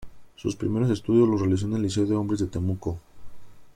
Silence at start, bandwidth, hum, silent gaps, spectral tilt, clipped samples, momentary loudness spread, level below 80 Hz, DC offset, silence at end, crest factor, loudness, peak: 0 s; 11.5 kHz; none; none; -7.5 dB/octave; under 0.1%; 12 LU; -50 dBFS; under 0.1%; 0.05 s; 16 dB; -25 LUFS; -10 dBFS